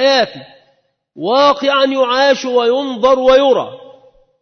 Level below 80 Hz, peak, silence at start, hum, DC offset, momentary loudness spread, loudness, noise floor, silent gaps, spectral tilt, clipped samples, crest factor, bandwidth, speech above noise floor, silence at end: -50 dBFS; -2 dBFS; 0 s; none; under 0.1%; 7 LU; -13 LUFS; -59 dBFS; none; -3.5 dB/octave; under 0.1%; 12 dB; 6.6 kHz; 47 dB; 0.65 s